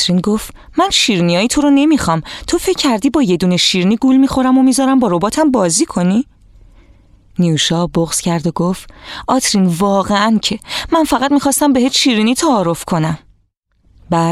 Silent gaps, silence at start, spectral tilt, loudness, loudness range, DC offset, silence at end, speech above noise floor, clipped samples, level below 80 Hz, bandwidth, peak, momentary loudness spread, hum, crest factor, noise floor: 13.57-13.63 s; 0 s; -4.5 dB/octave; -13 LUFS; 4 LU; under 0.1%; 0 s; 46 dB; under 0.1%; -40 dBFS; 15 kHz; 0 dBFS; 8 LU; none; 12 dB; -59 dBFS